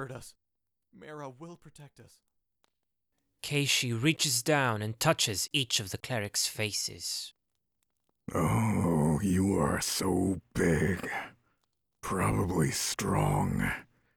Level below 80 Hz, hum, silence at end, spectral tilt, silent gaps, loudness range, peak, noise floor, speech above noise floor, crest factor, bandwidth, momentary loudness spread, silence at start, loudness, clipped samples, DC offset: -52 dBFS; none; 0.35 s; -4 dB/octave; none; 4 LU; -10 dBFS; -87 dBFS; 57 dB; 20 dB; 19.5 kHz; 17 LU; 0 s; -29 LUFS; under 0.1%; under 0.1%